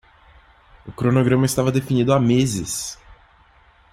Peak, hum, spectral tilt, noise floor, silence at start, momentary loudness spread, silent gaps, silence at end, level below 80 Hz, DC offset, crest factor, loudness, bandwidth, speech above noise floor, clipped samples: -4 dBFS; none; -6 dB/octave; -53 dBFS; 0.85 s; 13 LU; none; 0.8 s; -48 dBFS; under 0.1%; 16 dB; -19 LUFS; 15.5 kHz; 35 dB; under 0.1%